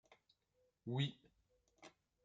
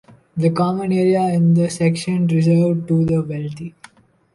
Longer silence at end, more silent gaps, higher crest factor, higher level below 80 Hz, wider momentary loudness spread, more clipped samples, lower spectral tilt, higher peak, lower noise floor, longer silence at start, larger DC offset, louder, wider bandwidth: second, 0.35 s vs 0.65 s; neither; first, 22 dB vs 14 dB; second, -84 dBFS vs -54 dBFS; first, 22 LU vs 12 LU; neither; about the same, -6.5 dB/octave vs -7.5 dB/octave; second, -28 dBFS vs -4 dBFS; first, -82 dBFS vs -48 dBFS; first, 0.85 s vs 0.35 s; neither; second, -44 LUFS vs -17 LUFS; second, 7.6 kHz vs 11.5 kHz